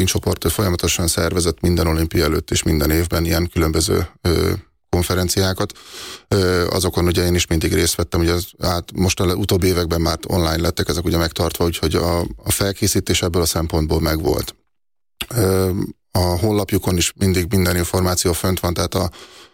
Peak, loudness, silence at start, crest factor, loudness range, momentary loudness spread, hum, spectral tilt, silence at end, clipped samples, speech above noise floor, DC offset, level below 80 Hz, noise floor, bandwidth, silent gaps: -6 dBFS; -19 LUFS; 0 s; 12 dB; 2 LU; 5 LU; none; -4.5 dB/octave; 0.1 s; under 0.1%; 68 dB; under 0.1%; -32 dBFS; -86 dBFS; 17 kHz; none